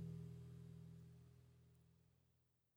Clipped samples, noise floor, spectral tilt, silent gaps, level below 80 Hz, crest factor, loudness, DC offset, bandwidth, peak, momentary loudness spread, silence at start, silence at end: under 0.1%; -83 dBFS; -8.5 dB/octave; none; -76 dBFS; 18 dB; -59 LUFS; under 0.1%; over 20 kHz; -42 dBFS; 12 LU; 0 s; 0.35 s